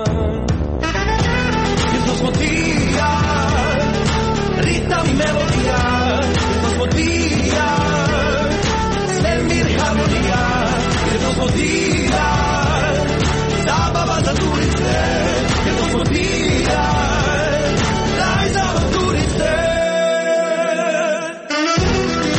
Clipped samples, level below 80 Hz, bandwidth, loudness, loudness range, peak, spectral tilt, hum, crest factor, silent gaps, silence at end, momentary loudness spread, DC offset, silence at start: under 0.1%; -26 dBFS; 8.8 kHz; -17 LUFS; 0 LU; -6 dBFS; -5 dB/octave; none; 10 dB; none; 0 s; 1 LU; under 0.1%; 0 s